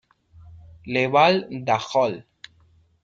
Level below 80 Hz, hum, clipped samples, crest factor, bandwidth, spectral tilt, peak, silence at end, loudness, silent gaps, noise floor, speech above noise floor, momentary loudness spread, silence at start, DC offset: -60 dBFS; none; under 0.1%; 20 dB; 7.8 kHz; -5.5 dB/octave; -4 dBFS; 0.8 s; -21 LUFS; none; -59 dBFS; 38 dB; 14 LU; 0.45 s; under 0.1%